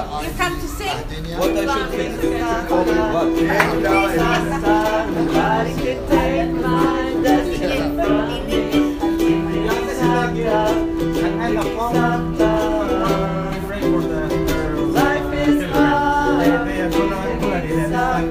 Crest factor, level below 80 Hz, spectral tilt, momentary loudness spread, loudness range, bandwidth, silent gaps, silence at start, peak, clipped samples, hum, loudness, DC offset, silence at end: 18 dB; -32 dBFS; -6 dB/octave; 5 LU; 2 LU; 15.5 kHz; none; 0 s; 0 dBFS; under 0.1%; none; -19 LUFS; under 0.1%; 0 s